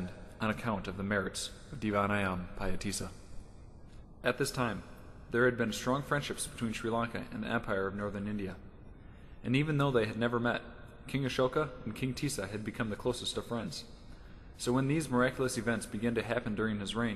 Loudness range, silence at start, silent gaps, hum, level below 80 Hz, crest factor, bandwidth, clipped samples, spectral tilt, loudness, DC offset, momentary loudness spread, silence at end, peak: 3 LU; 0 s; none; none; -52 dBFS; 20 dB; 13 kHz; under 0.1%; -5 dB/octave; -34 LUFS; under 0.1%; 20 LU; 0 s; -14 dBFS